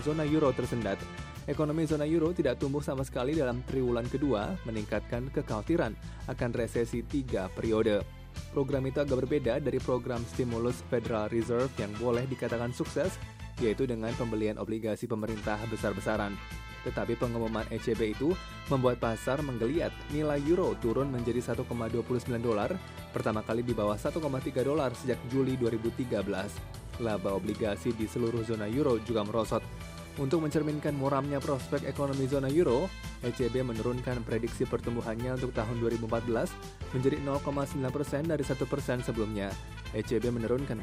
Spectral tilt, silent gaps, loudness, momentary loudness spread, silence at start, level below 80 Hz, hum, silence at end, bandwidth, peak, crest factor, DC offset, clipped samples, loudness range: -6.5 dB/octave; none; -32 LUFS; 7 LU; 0 s; -46 dBFS; none; 0 s; 15.5 kHz; -14 dBFS; 18 dB; under 0.1%; under 0.1%; 2 LU